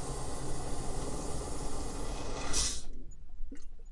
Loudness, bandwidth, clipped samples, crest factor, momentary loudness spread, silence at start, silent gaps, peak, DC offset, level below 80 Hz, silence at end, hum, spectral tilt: -38 LUFS; 11.5 kHz; under 0.1%; 16 dB; 19 LU; 0 s; none; -16 dBFS; under 0.1%; -40 dBFS; 0 s; none; -3 dB/octave